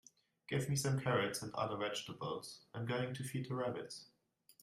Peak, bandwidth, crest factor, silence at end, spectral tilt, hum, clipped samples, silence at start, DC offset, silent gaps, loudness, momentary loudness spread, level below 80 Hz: -20 dBFS; 15.5 kHz; 22 dB; 0.6 s; -5 dB/octave; none; under 0.1%; 0.5 s; under 0.1%; none; -40 LUFS; 11 LU; -74 dBFS